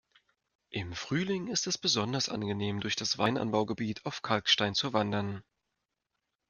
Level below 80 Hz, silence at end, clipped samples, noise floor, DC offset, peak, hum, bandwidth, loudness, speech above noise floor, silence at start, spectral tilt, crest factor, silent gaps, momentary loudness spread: -66 dBFS; 1.1 s; under 0.1%; -85 dBFS; under 0.1%; -10 dBFS; none; 10.5 kHz; -31 LUFS; 53 dB; 0.7 s; -3.5 dB/octave; 24 dB; none; 11 LU